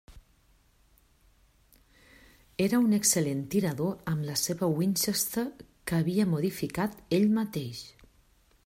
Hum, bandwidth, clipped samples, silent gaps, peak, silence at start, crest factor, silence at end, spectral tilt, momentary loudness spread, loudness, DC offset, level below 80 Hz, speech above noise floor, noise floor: none; 16 kHz; under 0.1%; none; -8 dBFS; 0.1 s; 22 dB; 0.75 s; -4.5 dB/octave; 13 LU; -28 LUFS; under 0.1%; -60 dBFS; 36 dB; -64 dBFS